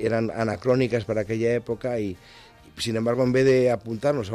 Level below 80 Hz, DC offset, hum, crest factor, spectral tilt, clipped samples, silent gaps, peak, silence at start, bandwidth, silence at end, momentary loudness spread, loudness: -54 dBFS; under 0.1%; none; 14 dB; -6.5 dB/octave; under 0.1%; none; -10 dBFS; 0 s; 13.5 kHz; 0 s; 10 LU; -24 LUFS